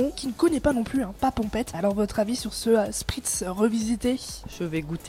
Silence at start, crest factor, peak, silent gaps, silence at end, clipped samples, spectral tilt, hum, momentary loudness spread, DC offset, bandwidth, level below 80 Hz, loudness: 0 s; 16 dB; -10 dBFS; none; 0 s; under 0.1%; -4.5 dB/octave; none; 7 LU; under 0.1%; 16.5 kHz; -44 dBFS; -26 LUFS